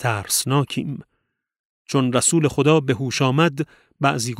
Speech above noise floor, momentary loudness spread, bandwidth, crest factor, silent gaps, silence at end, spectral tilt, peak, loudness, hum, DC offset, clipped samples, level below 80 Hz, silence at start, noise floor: 54 dB; 12 LU; 16 kHz; 18 dB; 1.59-1.85 s; 0 s; -4.5 dB/octave; -2 dBFS; -20 LUFS; none; under 0.1%; under 0.1%; -56 dBFS; 0 s; -74 dBFS